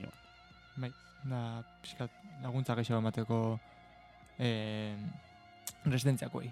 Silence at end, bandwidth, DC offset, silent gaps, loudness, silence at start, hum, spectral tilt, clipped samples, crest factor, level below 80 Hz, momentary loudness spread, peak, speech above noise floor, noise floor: 0 s; 14.5 kHz; under 0.1%; none; -37 LUFS; 0 s; none; -6.5 dB/octave; under 0.1%; 18 dB; -68 dBFS; 21 LU; -18 dBFS; 23 dB; -59 dBFS